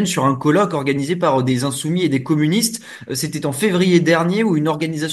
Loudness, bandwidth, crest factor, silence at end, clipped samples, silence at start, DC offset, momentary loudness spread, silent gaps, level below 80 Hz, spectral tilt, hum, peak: -17 LUFS; 12.5 kHz; 16 dB; 0 s; under 0.1%; 0 s; under 0.1%; 7 LU; none; -60 dBFS; -5 dB/octave; none; -2 dBFS